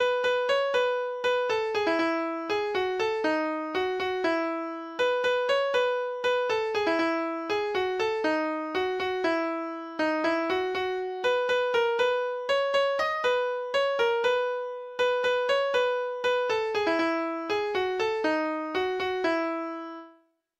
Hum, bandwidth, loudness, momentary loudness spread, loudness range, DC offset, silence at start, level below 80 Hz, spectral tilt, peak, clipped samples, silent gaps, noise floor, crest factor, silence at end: none; 11.5 kHz; -27 LUFS; 5 LU; 2 LU; under 0.1%; 0 s; -66 dBFS; -3.5 dB/octave; -14 dBFS; under 0.1%; none; -61 dBFS; 14 dB; 0.5 s